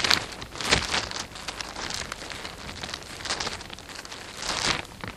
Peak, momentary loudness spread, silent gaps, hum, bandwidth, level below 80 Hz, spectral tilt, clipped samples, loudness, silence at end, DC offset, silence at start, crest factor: 0 dBFS; 14 LU; none; none; 16 kHz; -48 dBFS; -1.5 dB/octave; under 0.1%; -29 LUFS; 0 s; under 0.1%; 0 s; 30 dB